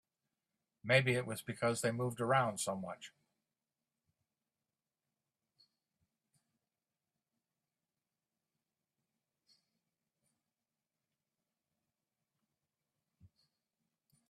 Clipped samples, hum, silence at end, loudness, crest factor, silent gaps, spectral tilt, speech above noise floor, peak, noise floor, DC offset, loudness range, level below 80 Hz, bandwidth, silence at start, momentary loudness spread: under 0.1%; none; 1.05 s; -35 LUFS; 28 dB; none; -4.5 dB/octave; over 55 dB; -16 dBFS; under -90 dBFS; under 0.1%; 12 LU; -80 dBFS; 13.5 kHz; 0.85 s; 18 LU